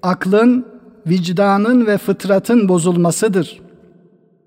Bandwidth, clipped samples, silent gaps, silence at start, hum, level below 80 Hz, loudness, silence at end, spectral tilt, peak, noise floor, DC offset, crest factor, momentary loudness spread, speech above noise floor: 16 kHz; under 0.1%; none; 0.05 s; none; -62 dBFS; -14 LUFS; 0.95 s; -6 dB/octave; -2 dBFS; -51 dBFS; under 0.1%; 14 dB; 7 LU; 37 dB